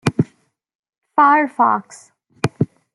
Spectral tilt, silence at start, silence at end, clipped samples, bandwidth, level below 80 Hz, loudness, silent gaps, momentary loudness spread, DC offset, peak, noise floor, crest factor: -6.5 dB/octave; 0.05 s; 0.3 s; under 0.1%; 12 kHz; -56 dBFS; -17 LUFS; 0.75-0.83 s, 0.98-1.02 s; 12 LU; under 0.1%; -2 dBFS; -58 dBFS; 18 dB